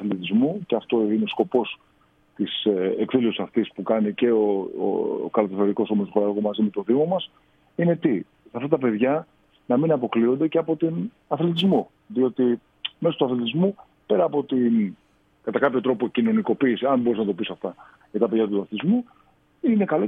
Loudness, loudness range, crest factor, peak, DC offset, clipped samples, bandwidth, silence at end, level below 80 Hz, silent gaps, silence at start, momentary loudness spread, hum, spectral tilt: -23 LUFS; 1 LU; 18 dB; -4 dBFS; under 0.1%; under 0.1%; 4.3 kHz; 0 s; -70 dBFS; none; 0 s; 8 LU; none; -9 dB/octave